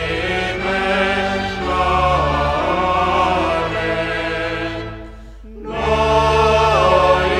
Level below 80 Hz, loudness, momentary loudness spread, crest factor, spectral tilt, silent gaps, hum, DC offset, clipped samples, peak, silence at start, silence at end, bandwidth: -30 dBFS; -17 LUFS; 11 LU; 16 dB; -5.5 dB/octave; none; none; under 0.1%; under 0.1%; -2 dBFS; 0 s; 0 s; 12.5 kHz